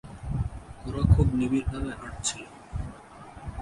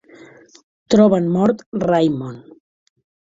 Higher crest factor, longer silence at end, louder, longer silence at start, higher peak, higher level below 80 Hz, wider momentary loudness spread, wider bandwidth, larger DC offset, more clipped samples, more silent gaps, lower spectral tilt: about the same, 20 dB vs 18 dB; second, 0 s vs 0.85 s; second, -28 LUFS vs -17 LUFS; second, 0.05 s vs 0.9 s; second, -8 dBFS vs -2 dBFS; first, -34 dBFS vs -54 dBFS; first, 19 LU vs 11 LU; first, 11.5 kHz vs 7.8 kHz; neither; neither; second, none vs 1.66-1.72 s; second, -6 dB/octave vs -7.5 dB/octave